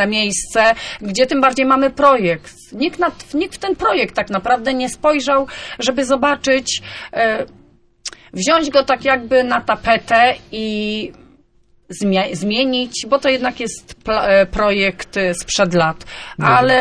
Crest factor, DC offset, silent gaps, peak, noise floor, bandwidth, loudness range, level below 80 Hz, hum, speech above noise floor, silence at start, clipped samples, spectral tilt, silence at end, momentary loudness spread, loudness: 16 dB; under 0.1%; none; -2 dBFS; -53 dBFS; 11 kHz; 3 LU; -42 dBFS; none; 37 dB; 0 s; under 0.1%; -3.5 dB/octave; 0 s; 12 LU; -16 LUFS